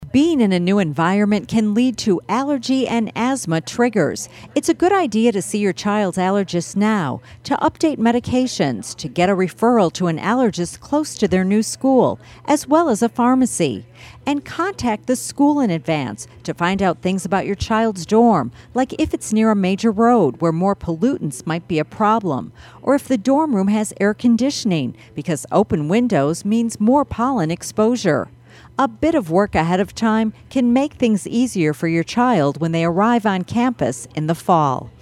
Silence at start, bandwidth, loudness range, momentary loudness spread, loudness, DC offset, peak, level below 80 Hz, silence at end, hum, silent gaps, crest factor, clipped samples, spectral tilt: 0 s; 14 kHz; 2 LU; 7 LU; -18 LUFS; under 0.1%; -2 dBFS; -48 dBFS; 0.1 s; none; none; 16 dB; under 0.1%; -5.5 dB/octave